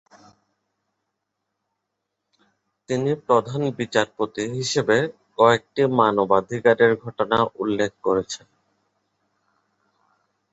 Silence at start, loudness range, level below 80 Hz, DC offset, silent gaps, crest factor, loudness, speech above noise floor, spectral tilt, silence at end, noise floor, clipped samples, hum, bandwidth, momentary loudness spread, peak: 2.9 s; 8 LU; -60 dBFS; under 0.1%; none; 20 dB; -21 LUFS; 59 dB; -5 dB/octave; 2.15 s; -80 dBFS; under 0.1%; none; 8 kHz; 9 LU; -2 dBFS